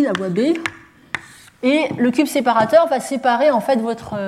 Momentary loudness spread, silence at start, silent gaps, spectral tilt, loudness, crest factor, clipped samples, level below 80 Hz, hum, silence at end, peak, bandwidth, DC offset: 14 LU; 0 s; none; -5 dB/octave; -17 LUFS; 16 dB; under 0.1%; -58 dBFS; none; 0 s; -2 dBFS; 15 kHz; under 0.1%